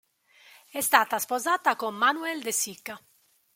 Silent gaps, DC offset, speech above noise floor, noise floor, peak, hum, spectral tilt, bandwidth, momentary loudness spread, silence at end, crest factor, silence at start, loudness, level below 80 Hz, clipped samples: none; under 0.1%; 31 dB; -58 dBFS; -2 dBFS; none; -0.5 dB/octave; 17 kHz; 17 LU; 0.6 s; 26 dB; 0.75 s; -25 LUFS; -76 dBFS; under 0.1%